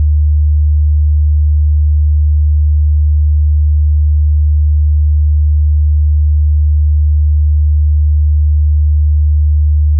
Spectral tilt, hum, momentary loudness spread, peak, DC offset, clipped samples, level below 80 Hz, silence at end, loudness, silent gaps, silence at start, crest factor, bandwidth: -16 dB/octave; none; 0 LU; -6 dBFS; under 0.1%; under 0.1%; -12 dBFS; 0 s; -12 LUFS; none; 0 s; 4 dB; 0.2 kHz